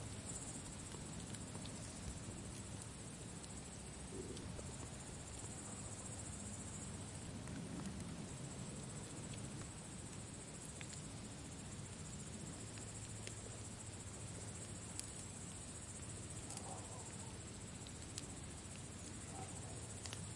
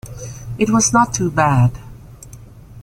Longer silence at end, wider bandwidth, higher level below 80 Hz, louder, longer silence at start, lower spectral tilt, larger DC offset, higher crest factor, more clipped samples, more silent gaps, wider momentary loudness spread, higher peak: about the same, 0 s vs 0 s; second, 11.5 kHz vs 15.5 kHz; second, -62 dBFS vs -40 dBFS; second, -50 LUFS vs -15 LUFS; about the same, 0 s vs 0.05 s; about the same, -4 dB/octave vs -5 dB/octave; neither; first, 26 dB vs 16 dB; neither; neither; second, 3 LU vs 19 LU; second, -24 dBFS vs -2 dBFS